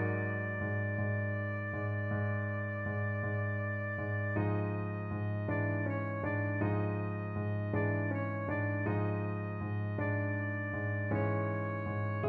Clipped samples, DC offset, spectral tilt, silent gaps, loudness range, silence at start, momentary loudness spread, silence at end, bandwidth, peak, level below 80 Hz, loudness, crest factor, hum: under 0.1%; under 0.1%; -11 dB/octave; none; 1 LU; 0 s; 3 LU; 0 s; 4 kHz; -20 dBFS; -62 dBFS; -35 LUFS; 14 dB; none